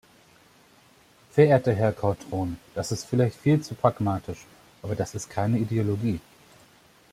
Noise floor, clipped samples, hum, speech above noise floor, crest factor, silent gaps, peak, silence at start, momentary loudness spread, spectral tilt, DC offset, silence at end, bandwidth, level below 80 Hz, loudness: -57 dBFS; under 0.1%; none; 33 dB; 22 dB; none; -6 dBFS; 1.35 s; 13 LU; -7 dB/octave; under 0.1%; 0.9 s; 15.5 kHz; -56 dBFS; -26 LUFS